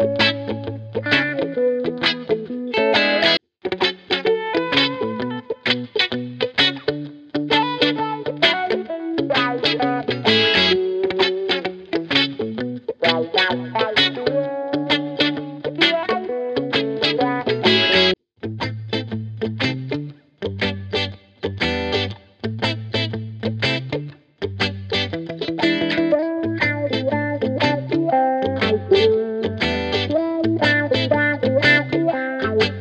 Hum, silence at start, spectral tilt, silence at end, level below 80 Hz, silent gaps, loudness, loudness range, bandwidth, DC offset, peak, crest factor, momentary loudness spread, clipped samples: none; 0 s; -5.5 dB/octave; 0 s; -50 dBFS; none; -20 LUFS; 6 LU; 9 kHz; under 0.1%; 0 dBFS; 20 dB; 11 LU; under 0.1%